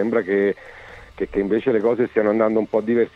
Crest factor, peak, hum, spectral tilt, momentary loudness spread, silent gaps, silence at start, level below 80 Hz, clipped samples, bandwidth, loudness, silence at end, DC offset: 16 dB; -4 dBFS; none; -8.5 dB/octave; 16 LU; none; 0 s; -50 dBFS; under 0.1%; 6.4 kHz; -20 LUFS; 0.05 s; under 0.1%